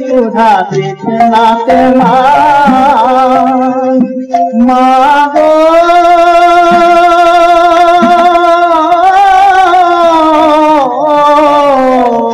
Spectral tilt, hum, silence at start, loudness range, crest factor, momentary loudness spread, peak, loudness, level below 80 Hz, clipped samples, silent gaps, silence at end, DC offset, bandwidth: -5.5 dB/octave; none; 0 s; 2 LU; 6 dB; 5 LU; 0 dBFS; -6 LUFS; -40 dBFS; under 0.1%; none; 0 s; under 0.1%; 13 kHz